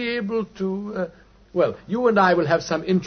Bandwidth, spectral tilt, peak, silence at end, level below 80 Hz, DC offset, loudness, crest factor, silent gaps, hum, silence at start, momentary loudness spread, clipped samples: 6.6 kHz; -6.5 dB/octave; -4 dBFS; 0 s; -56 dBFS; under 0.1%; -22 LUFS; 18 dB; none; none; 0 s; 12 LU; under 0.1%